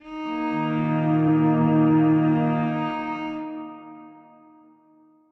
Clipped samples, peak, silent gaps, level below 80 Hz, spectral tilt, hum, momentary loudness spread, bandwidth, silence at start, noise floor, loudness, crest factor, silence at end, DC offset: under 0.1%; -10 dBFS; none; -62 dBFS; -10 dB/octave; none; 16 LU; 4.5 kHz; 0.05 s; -57 dBFS; -22 LUFS; 14 dB; 1.2 s; under 0.1%